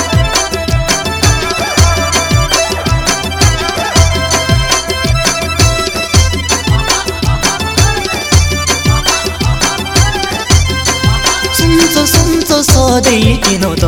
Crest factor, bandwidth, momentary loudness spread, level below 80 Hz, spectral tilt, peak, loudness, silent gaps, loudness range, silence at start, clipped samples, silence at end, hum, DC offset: 10 dB; 20 kHz; 4 LU; -20 dBFS; -3.5 dB/octave; 0 dBFS; -10 LUFS; none; 2 LU; 0 s; 0.8%; 0 s; none; under 0.1%